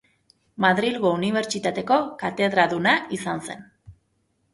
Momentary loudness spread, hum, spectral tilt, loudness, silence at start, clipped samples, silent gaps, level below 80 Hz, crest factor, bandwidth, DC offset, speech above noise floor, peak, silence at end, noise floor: 10 LU; none; -4.5 dB/octave; -22 LUFS; 0.6 s; under 0.1%; none; -62 dBFS; 20 dB; 11.5 kHz; under 0.1%; 47 dB; -4 dBFS; 0.6 s; -70 dBFS